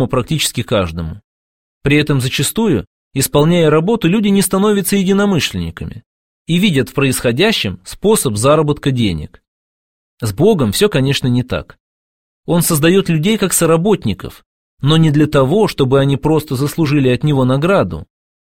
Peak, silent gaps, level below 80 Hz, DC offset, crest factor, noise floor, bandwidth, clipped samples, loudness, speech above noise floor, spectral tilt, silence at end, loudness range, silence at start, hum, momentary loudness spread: 0 dBFS; 1.24-1.81 s, 2.87-3.11 s, 6.06-6.45 s, 9.48-10.17 s, 11.80-12.43 s, 14.46-14.77 s; -38 dBFS; 0.6%; 14 dB; under -90 dBFS; 16.5 kHz; under 0.1%; -14 LUFS; over 77 dB; -5 dB/octave; 0.45 s; 3 LU; 0 s; none; 11 LU